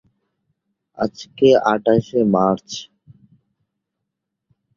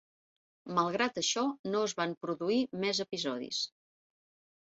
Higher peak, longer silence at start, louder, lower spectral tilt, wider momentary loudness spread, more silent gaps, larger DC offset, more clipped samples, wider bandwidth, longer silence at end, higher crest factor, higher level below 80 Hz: first, -2 dBFS vs -16 dBFS; first, 1 s vs 0.65 s; first, -18 LUFS vs -33 LUFS; first, -6.5 dB/octave vs -2.5 dB/octave; first, 11 LU vs 5 LU; second, none vs 1.59-1.64 s, 2.17-2.21 s; neither; neither; about the same, 7.4 kHz vs 8 kHz; first, 1.95 s vs 1 s; about the same, 20 dB vs 20 dB; first, -58 dBFS vs -76 dBFS